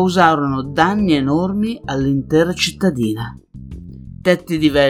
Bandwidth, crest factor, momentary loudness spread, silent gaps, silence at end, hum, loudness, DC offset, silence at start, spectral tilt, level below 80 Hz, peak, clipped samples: 15 kHz; 16 dB; 21 LU; none; 0 s; none; -17 LUFS; under 0.1%; 0 s; -5.5 dB/octave; -40 dBFS; 0 dBFS; under 0.1%